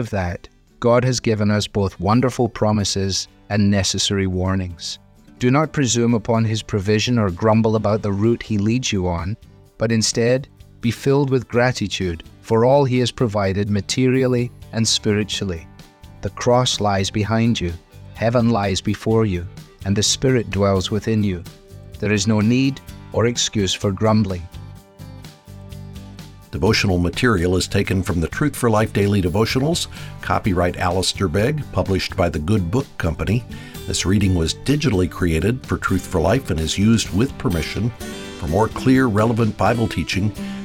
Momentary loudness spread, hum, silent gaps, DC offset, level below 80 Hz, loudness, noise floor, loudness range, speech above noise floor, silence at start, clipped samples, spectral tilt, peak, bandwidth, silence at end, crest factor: 11 LU; none; none; under 0.1%; -40 dBFS; -19 LUFS; -42 dBFS; 2 LU; 24 dB; 0 s; under 0.1%; -5 dB/octave; -2 dBFS; 16 kHz; 0 s; 16 dB